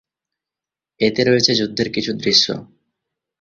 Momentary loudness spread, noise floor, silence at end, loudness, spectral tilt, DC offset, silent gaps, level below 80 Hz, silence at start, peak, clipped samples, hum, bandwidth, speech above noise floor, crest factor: 7 LU; -88 dBFS; 0.75 s; -16 LUFS; -3.5 dB/octave; under 0.1%; none; -56 dBFS; 1 s; -2 dBFS; under 0.1%; none; 7.6 kHz; 71 dB; 20 dB